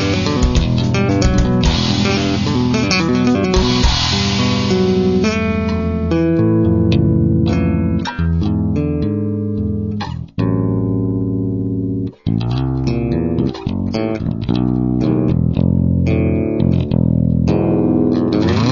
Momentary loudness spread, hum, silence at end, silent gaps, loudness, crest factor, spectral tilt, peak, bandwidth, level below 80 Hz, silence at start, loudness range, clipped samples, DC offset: 6 LU; none; 0 s; none; -16 LUFS; 14 dB; -6.5 dB/octave; -2 dBFS; 7.4 kHz; -26 dBFS; 0 s; 4 LU; under 0.1%; under 0.1%